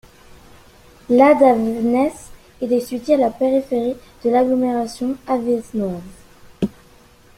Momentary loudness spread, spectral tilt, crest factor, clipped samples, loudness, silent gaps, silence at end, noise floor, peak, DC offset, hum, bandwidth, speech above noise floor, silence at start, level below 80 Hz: 13 LU; -6.5 dB/octave; 18 dB; under 0.1%; -18 LUFS; none; 0.7 s; -48 dBFS; -2 dBFS; under 0.1%; none; 15 kHz; 31 dB; 1.1 s; -50 dBFS